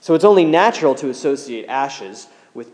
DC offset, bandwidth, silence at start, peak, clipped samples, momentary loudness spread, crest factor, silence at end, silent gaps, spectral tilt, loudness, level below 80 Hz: under 0.1%; 10.5 kHz; 0.05 s; 0 dBFS; under 0.1%; 19 LU; 16 dB; 0.1 s; none; -5 dB/octave; -16 LUFS; -74 dBFS